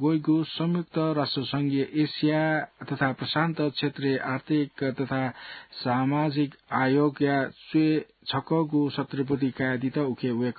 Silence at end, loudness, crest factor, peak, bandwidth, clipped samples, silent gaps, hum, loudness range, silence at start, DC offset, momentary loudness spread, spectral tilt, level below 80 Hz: 0 s; -27 LUFS; 16 dB; -10 dBFS; 4.8 kHz; under 0.1%; none; none; 2 LU; 0 s; under 0.1%; 6 LU; -11 dB/octave; -66 dBFS